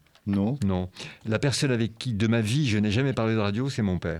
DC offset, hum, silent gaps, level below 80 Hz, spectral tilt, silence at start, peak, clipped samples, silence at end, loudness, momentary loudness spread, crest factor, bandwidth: under 0.1%; none; none; -54 dBFS; -6 dB/octave; 0.25 s; -10 dBFS; under 0.1%; 0 s; -26 LUFS; 6 LU; 16 dB; 13.5 kHz